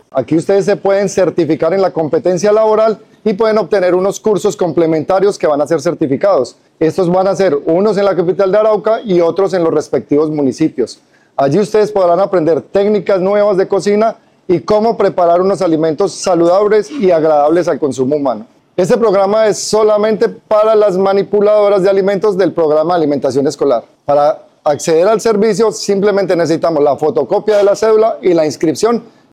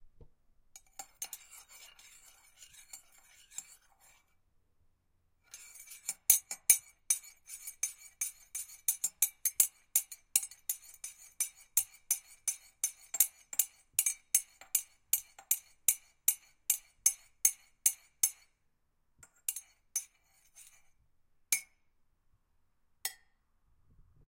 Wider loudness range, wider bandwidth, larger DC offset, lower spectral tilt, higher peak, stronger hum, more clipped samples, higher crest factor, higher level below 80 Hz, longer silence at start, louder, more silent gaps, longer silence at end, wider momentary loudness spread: second, 2 LU vs 19 LU; second, 13.5 kHz vs 17 kHz; neither; first, -6 dB/octave vs 3.5 dB/octave; first, -2 dBFS vs -6 dBFS; neither; neither; second, 8 dB vs 32 dB; first, -52 dBFS vs -72 dBFS; second, 0.15 s vs 1 s; first, -12 LUFS vs -32 LUFS; neither; second, 0.3 s vs 1.2 s; second, 5 LU vs 20 LU